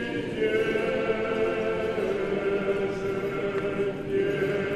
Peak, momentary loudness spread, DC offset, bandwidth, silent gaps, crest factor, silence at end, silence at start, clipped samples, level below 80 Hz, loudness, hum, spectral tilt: -14 dBFS; 3 LU; under 0.1%; 13 kHz; none; 14 dB; 0 s; 0 s; under 0.1%; -52 dBFS; -27 LUFS; none; -6.5 dB/octave